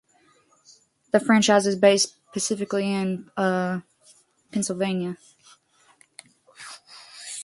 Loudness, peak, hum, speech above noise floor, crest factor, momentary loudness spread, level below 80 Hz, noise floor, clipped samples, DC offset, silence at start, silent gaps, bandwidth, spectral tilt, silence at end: -23 LUFS; -4 dBFS; none; 39 dB; 22 dB; 23 LU; -70 dBFS; -61 dBFS; under 0.1%; under 0.1%; 1.15 s; none; 11.5 kHz; -4 dB/octave; 0 s